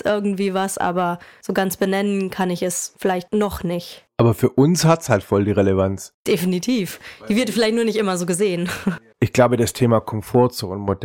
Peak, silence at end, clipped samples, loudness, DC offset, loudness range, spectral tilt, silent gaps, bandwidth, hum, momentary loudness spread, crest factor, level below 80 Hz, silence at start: -2 dBFS; 0 s; under 0.1%; -20 LUFS; under 0.1%; 3 LU; -5.5 dB/octave; 6.14-6.25 s; 17 kHz; none; 8 LU; 18 dB; -50 dBFS; 0.05 s